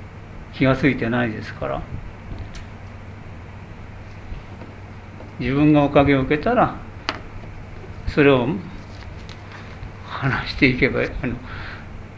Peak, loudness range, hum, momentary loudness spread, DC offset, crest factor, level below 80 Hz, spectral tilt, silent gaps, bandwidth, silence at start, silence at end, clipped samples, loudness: 0 dBFS; 14 LU; none; 22 LU; under 0.1%; 22 dB; -38 dBFS; -7.5 dB/octave; none; 7.8 kHz; 0 s; 0 s; under 0.1%; -20 LUFS